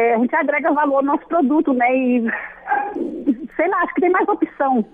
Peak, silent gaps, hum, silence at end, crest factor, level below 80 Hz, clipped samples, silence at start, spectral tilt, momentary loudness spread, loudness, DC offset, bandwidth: -6 dBFS; none; none; 0.05 s; 12 dB; -58 dBFS; under 0.1%; 0 s; -8.5 dB/octave; 6 LU; -18 LUFS; under 0.1%; 3.8 kHz